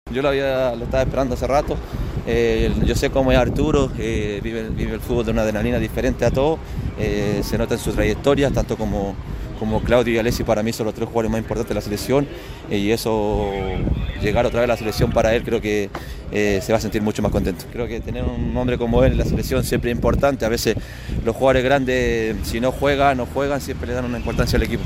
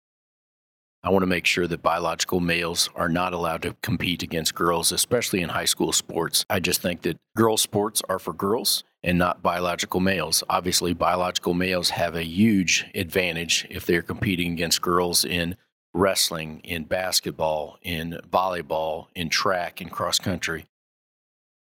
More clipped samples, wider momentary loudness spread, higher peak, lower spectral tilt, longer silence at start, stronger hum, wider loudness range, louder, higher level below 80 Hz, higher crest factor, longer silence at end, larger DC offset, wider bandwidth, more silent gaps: neither; about the same, 8 LU vs 8 LU; about the same, -4 dBFS vs -6 dBFS; first, -6 dB/octave vs -3 dB/octave; second, 0.05 s vs 1.05 s; neither; about the same, 2 LU vs 3 LU; about the same, -21 LUFS vs -23 LUFS; first, -30 dBFS vs -52 dBFS; about the same, 16 dB vs 18 dB; second, 0 s vs 1.1 s; neither; second, 16 kHz vs 18 kHz; second, none vs 15.72-15.93 s